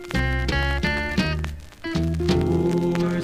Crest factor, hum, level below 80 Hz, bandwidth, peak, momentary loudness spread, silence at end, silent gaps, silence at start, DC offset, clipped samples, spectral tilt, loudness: 16 dB; none; -30 dBFS; 15 kHz; -6 dBFS; 8 LU; 0 s; none; 0 s; 0.2%; under 0.1%; -6.5 dB/octave; -23 LUFS